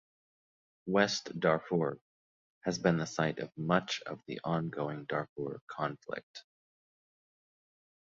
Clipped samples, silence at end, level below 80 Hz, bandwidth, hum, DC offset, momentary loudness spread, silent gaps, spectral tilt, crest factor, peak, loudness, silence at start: under 0.1%; 1.6 s; -70 dBFS; 7.6 kHz; none; under 0.1%; 13 LU; 2.01-2.61 s, 5.29-5.36 s, 5.61-5.67 s, 6.23-6.34 s; -5 dB/octave; 24 dB; -12 dBFS; -34 LUFS; 0.85 s